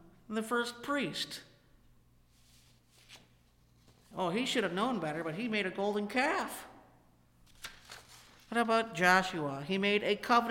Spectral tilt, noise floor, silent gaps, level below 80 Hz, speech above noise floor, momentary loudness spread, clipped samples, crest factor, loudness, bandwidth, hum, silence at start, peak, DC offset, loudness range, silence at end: -4 dB/octave; -66 dBFS; none; -68 dBFS; 34 dB; 20 LU; under 0.1%; 24 dB; -32 LUFS; 16.5 kHz; 60 Hz at -65 dBFS; 0.3 s; -12 dBFS; under 0.1%; 10 LU; 0 s